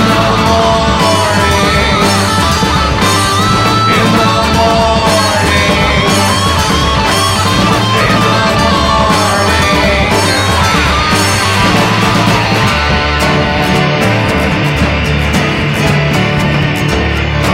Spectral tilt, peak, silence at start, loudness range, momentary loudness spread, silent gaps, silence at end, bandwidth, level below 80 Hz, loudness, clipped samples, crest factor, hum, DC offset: -4.5 dB/octave; 0 dBFS; 0 s; 2 LU; 2 LU; none; 0 s; 16.5 kHz; -22 dBFS; -9 LUFS; under 0.1%; 10 dB; none; under 0.1%